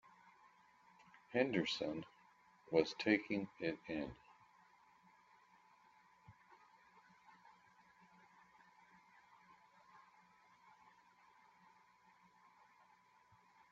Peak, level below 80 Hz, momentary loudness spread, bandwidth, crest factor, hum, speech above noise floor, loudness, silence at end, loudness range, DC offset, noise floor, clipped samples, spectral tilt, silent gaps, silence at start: -18 dBFS; -80 dBFS; 29 LU; 7.6 kHz; 28 dB; none; 31 dB; -40 LUFS; 3.75 s; 26 LU; under 0.1%; -71 dBFS; under 0.1%; -3.5 dB/octave; none; 1.3 s